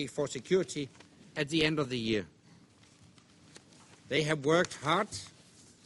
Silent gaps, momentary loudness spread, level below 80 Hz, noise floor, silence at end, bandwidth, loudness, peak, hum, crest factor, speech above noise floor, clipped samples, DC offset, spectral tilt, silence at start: none; 15 LU; -64 dBFS; -60 dBFS; 0.55 s; 11.5 kHz; -32 LUFS; -12 dBFS; none; 22 dB; 29 dB; under 0.1%; under 0.1%; -4.5 dB/octave; 0 s